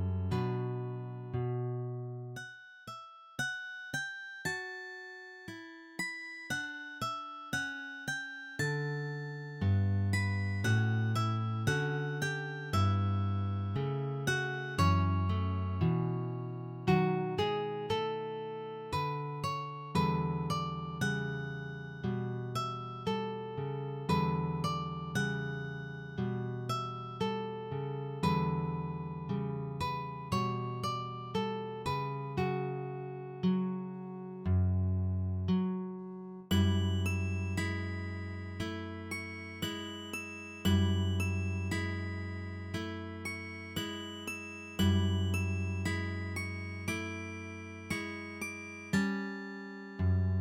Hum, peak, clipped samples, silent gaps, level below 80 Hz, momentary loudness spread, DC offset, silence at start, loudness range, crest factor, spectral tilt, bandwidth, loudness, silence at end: none; -16 dBFS; under 0.1%; none; -58 dBFS; 11 LU; under 0.1%; 0 s; 7 LU; 18 dB; -6 dB/octave; 16 kHz; -35 LUFS; 0 s